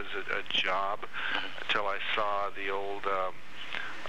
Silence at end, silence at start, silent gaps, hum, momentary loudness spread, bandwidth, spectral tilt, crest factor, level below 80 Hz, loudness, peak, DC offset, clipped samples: 0 s; 0 s; none; none; 9 LU; 16 kHz; -3 dB/octave; 18 dB; -68 dBFS; -32 LUFS; -14 dBFS; 2%; under 0.1%